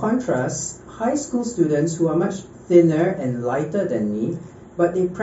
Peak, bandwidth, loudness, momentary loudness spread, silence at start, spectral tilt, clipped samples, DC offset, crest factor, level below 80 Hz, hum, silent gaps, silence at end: -2 dBFS; 8 kHz; -21 LUFS; 11 LU; 0 s; -7.5 dB/octave; under 0.1%; under 0.1%; 18 dB; -54 dBFS; none; none; 0 s